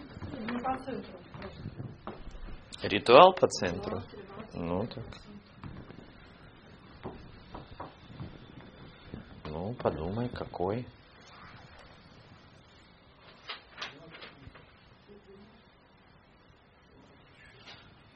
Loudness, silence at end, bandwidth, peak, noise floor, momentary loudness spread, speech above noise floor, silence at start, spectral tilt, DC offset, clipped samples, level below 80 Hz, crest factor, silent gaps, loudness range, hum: -29 LUFS; 0.4 s; 7 kHz; -2 dBFS; -60 dBFS; 21 LU; 32 dB; 0 s; -3.5 dB/octave; under 0.1%; under 0.1%; -56 dBFS; 32 dB; none; 22 LU; none